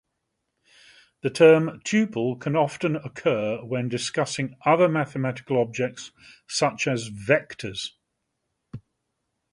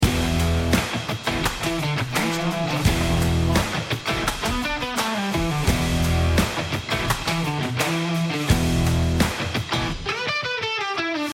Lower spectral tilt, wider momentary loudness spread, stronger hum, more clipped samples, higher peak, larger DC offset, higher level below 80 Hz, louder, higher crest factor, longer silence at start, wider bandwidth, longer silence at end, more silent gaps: about the same, -5 dB/octave vs -4.5 dB/octave; first, 15 LU vs 4 LU; neither; neither; about the same, -4 dBFS vs -6 dBFS; neither; second, -64 dBFS vs -32 dBFS; about the same, -24 LUFS vs -23 LUFS; first, 22 dB vs 16 dB; first, 1.25 s vs 0 s; second, 11.5 kHz vs 16.5 kHz; first, 0.75 s vs 0 s; neither